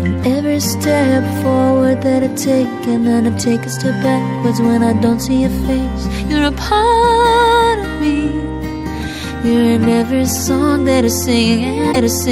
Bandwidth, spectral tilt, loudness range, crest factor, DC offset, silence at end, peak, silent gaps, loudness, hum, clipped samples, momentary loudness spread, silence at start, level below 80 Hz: 15.5 kHz; -5 dB/octave; 2 LU; 12 dB; under 0.1%; 0 s; -2 dBFS; none; -14 LUFS; none; under 0.1%; 7 LU; 0 s; -30 dBFS